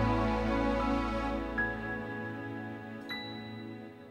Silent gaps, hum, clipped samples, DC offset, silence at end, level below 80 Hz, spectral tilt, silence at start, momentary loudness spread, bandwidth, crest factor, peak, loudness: none; none; under 0.1%; under 0.1%; 0 s; -44 dBFS; -7 dB/octave; 0 s; 13 LU; 12.5 kHz; 16 dB; -18 dBFS; -34 LUFS